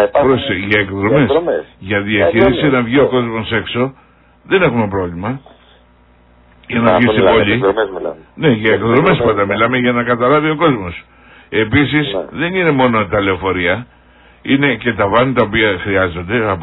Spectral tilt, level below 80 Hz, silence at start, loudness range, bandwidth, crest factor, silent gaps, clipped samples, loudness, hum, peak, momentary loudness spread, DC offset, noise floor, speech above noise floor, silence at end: -9.5 dB/octave; -40 dBFS; 0 s; 4 LU; 5.4 kHz; 14 dB; none; under 0.1%; -14 LUFS; 60 Hz at -40 dBFS; 0 dBFS; 9 LU; under 0.1%; -48 dBFS; 34 dB; 0 s